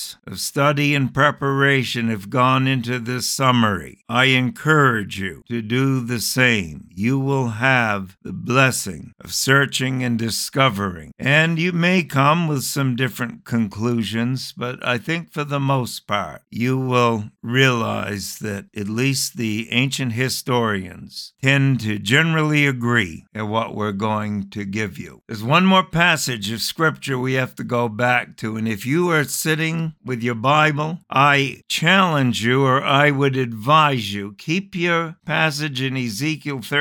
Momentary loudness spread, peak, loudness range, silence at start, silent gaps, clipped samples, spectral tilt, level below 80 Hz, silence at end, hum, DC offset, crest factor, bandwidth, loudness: 11 LU; 0 dBFS; 4 LU; 0 s; none; under 0.1%; -4.5 dB/octave; -56 dBFS; 0 s; none; under 0.1%; 18 dB; 19 kHz; -19 LUFS